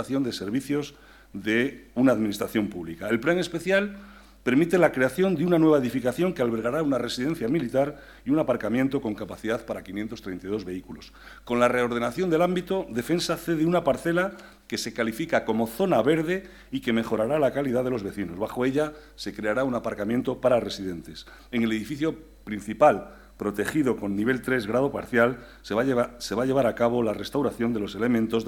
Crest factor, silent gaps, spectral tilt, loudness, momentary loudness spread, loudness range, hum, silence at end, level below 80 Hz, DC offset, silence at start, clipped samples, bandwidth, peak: 18 dB; none; -6 dB/octave; -26 LUFS; 12 LU; 4 LU; none; 0 s; -54 dBFS; under 0.1%; 0 s; under 0.1%; 18 kHz; -6 dBFS